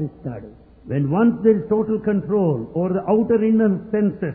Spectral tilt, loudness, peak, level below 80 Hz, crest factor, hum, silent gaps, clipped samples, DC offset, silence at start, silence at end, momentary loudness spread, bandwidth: -13.5 dB/octave; -19 LUFS; -4 dBFS; -52 dBFS; 16 dB; none; none; under 0.1%; under 0.1%; 0 s; 0 s; 11 LU; 3.3 kHz